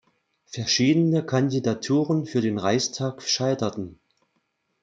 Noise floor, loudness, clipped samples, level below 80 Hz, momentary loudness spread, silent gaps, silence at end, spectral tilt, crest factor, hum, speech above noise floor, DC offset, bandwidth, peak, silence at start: -73 dBFS; -23 LUFS; under 0.1%; -66 dBFS; 10 LU; none; 0.9 s; -5 dB/octave; 16 dB; none; 50 dB; under 0.1%; 9.2 kHz; -8 dBFS; 0.5 s